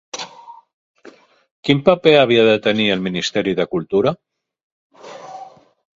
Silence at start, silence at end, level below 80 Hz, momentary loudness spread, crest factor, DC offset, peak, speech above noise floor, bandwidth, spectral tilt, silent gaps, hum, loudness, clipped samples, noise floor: 0.15 s; 0.5 s; -56 dBFS; 23 LU; 18 dB; under 0.1%; 0 dBFS; 31 dB; 7.8 kHz; -5 dB/octave; 0.73-0.94 s, 1.51-1.63 s, 4.63-4.90 s; none; -16 LUFS; under 0.1%; -46 dBFS